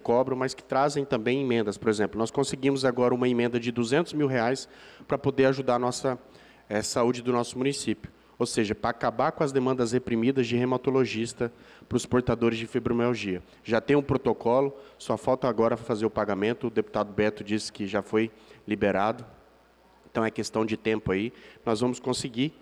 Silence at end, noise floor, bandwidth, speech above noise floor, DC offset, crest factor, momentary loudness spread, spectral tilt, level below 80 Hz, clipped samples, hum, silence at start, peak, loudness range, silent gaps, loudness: 0.1 s; -59 dBFS; 13 kHz; 32 dB; under 0.1%; 14 dB; 7 LU; -5.5 dB/octave; -56 dBFS; under 0.1%; none; 0.05 s; -12 dBFS; 3 LU; none; -27 LUFS